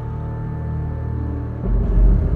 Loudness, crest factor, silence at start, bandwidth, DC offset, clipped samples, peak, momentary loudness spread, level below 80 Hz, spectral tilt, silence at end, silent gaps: -23 LUFS; 14 dB; 0 s; 2.4 kHz; under 0.1%; under 0.1%; -4 dBFS; 9 LU; -20 dBFS; -11.5 dB/octave; 0 s; none